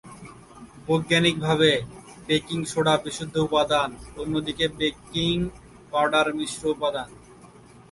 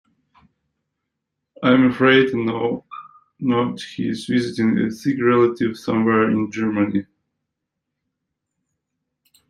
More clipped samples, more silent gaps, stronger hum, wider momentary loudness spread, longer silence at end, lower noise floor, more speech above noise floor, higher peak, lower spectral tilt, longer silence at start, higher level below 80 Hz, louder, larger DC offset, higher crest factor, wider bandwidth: neither; neither; neither; first, 16 LU vs 12 LU; second, 0.45 s vs 2.45 s; second, -49 dBFS vs -80 dBFS; second, 25 dB vs 62 dB; second, -6 dBFS vs -2 dBFS; second, -4.5 dB/octave vs -6.5 dB/octave; second, 0.05 s vs 1.6 s; first, -50 dBFS vs -62 dBFS; second, -24 LUFS vs -19 LUFS; neither; about the same, 20 dB vs 20 dB; about the same, 11.5 kHz vs 11.5 kHz